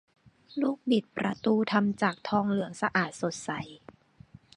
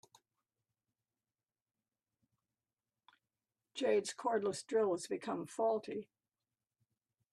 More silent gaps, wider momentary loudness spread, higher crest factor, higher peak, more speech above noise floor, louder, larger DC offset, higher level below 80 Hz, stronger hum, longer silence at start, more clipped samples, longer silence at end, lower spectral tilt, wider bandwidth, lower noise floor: neither; about the same, 10 LU vs 10 LU; about the same, 22 dB vs 20 dB; first, -8 dBFS vs -22 dBFS; second, 26 dB vs over 53 dB; first, -29 LUFS vs -37 LUFS; neither; first, -68 dBFS vs -86 dBFS; neither; second, 0.55 s vs 3.75 s; neither; second, 0.8 s vs 1.3 s; first, -5.5 dB/octave vs -4 dB/octave; second, 11 kHz vs 12.5 kHz; second, -55 dBFS vs under -90 dBFS